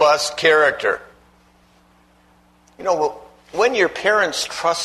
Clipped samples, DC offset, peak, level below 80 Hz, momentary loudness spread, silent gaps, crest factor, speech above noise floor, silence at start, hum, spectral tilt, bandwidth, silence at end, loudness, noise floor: under 0.1%; under 0.1%; -2 dBFS; -58 dBFS; 11 LU; none; 18 dB; 36 dB; 0 s; 60 Hz at -55 dBFS; -2 dB/octave; 13.5 kHz; 0 s; -18 LUFS; -54 dBFS